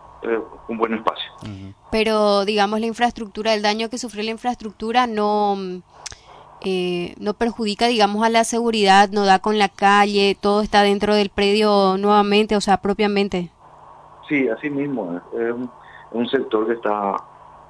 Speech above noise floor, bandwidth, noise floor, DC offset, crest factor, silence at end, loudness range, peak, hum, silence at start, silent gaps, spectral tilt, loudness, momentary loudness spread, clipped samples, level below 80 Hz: 26 dB; 11 kHz; -45 dBFS; under 0.1%; 16 dB; 0.45 s; 7 LU; -2 dBFS; none; 0.2 s; none; -4.5 dB/octave; -19 LUFS; 13 LU; under 0.1%; -50 dBFS